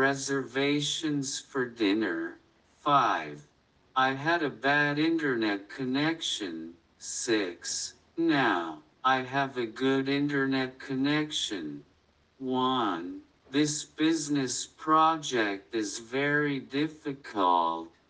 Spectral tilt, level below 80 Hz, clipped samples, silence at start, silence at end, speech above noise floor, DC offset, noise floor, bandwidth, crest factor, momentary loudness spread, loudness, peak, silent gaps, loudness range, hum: -3.5 dB/octave; -72 dBFS; under 0.1%; 0 s; 0.2 s; 37 dB; under 0.1%; -66 dBFS; 10 kHz; 18 dB; 12 LU; -29 LUFS; -10 dBFS; none; 3 LU; none